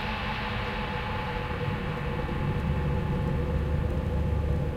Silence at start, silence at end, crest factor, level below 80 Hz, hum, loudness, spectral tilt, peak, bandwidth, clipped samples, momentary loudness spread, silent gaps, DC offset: 0 s; 0 s; 14 dB; -34 dBFS; none; -30 LUFS; -7.5 dB/octave; -16 dBFS; 10.5 kHz; under 0.1%; 3 LU; none; under 0.1%